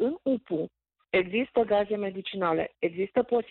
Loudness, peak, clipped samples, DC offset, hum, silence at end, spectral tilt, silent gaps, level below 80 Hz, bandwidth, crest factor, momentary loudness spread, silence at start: -28 LUFS; -14 dBFS; under 0.1%; under 0.1%; none; 0.05 s; -9.5 dB/octave; none; -64 dBFS; 4.3 kHz; 14 dB; 8 LU; 0 s